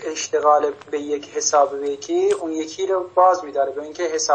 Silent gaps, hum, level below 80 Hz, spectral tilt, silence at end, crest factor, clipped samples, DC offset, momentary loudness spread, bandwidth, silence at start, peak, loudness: none; none; -72 dBFS; -2 dB/octave; 0 s; 16 dB; under 0.1%; under 0.1%; 10 LU; 8.8 kHz; 0 s; -4 dBFS; -20 LUFS